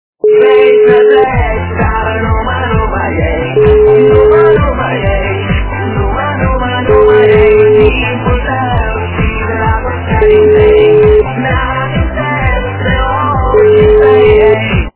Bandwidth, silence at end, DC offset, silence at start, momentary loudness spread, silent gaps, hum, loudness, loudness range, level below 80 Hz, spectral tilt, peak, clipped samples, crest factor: 4 kHz; 0.05 s; under 0.1%; 0.25 s; 8 LU; none; none; -9 LUFS; 1 LU; -18 dBFS; -10.5 dB/octave; 0 dBFS; 1%; 8 dB